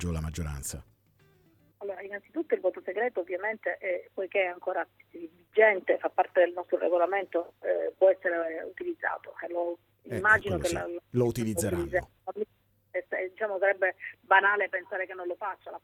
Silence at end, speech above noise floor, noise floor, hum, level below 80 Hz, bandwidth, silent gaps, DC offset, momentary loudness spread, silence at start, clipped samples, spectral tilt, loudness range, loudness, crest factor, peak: 0.05 s; 35 dB; -64 dBFS; none; -52 dBFS; 16.5 kHz; none; under 0.1%; 15 LU; 0 s; under 0.1%; -5 dB/octave; 6 LU; -29 LUFS; 22 dB; -8 dBFS